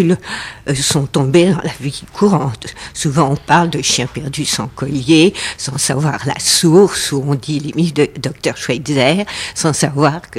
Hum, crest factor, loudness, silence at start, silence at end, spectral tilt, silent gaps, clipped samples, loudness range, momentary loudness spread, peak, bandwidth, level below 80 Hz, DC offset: none; 14 dB; -15 LUFS; 0 s; 0 s; -4.5 dB/octave; none; under 0.1%; 2 LU; 10 LU; 0 dBFS; 16 kHz; -44 dBFS; under 0.1%